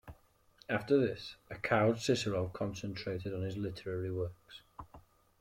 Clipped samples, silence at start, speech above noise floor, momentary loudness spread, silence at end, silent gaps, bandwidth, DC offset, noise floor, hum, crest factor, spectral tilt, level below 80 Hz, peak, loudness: under 0.1%; 0.05 s; 31 dB; 22 LU; 0.4 s; none; 16 kHz; under 0.1%; -65 dBFS; none; 20 dB; -6 dB/octave; -62 dBFS; -16 dBFS; -35 LUFS